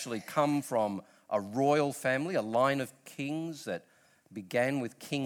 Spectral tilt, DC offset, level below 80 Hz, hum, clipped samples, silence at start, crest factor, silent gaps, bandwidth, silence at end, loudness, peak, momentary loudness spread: -5.5 dB/octave; under 0.1%; -78 dBFS; none; under 0.1%; 0 s; 18 dB; none; 19 kHz; 0 s; -32 LUFS; -14 dBFS; 12 LU